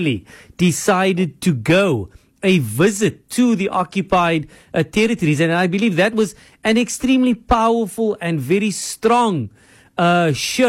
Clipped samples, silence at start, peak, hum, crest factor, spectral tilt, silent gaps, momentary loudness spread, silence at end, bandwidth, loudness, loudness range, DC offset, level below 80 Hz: under 0.1%; 0 s; -6 dBFS; none; 12 dB; -5 dB/octave; none; 7 LU; 0 s; 16.5 kHz; -17 LUFS; 1 LU; under 0.1%; -42 dBFS